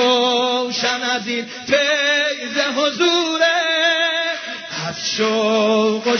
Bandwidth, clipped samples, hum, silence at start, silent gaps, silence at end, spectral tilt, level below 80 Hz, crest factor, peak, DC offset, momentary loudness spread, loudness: 6.6 kHz; under 0.1%; none; 0 s; none; 0 s; -2.5 dB/octave; -64 dBFS; 18 dB; -2 dBFS; under 0.1%; 8 LU; -17 LUFS